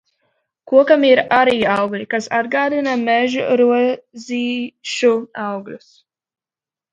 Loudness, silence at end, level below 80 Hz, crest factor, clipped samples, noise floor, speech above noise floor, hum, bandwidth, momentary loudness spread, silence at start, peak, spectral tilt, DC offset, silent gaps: -16 LUFS; 1.15 s; -62 dBFS; 18 dB; under 0.1%; under -90 dBFS; over 74 dB; none; 9.2 kHz; 13 LU; 0.65 s; 0 dBFS; -4.5 dB/octave; under 0.1%; none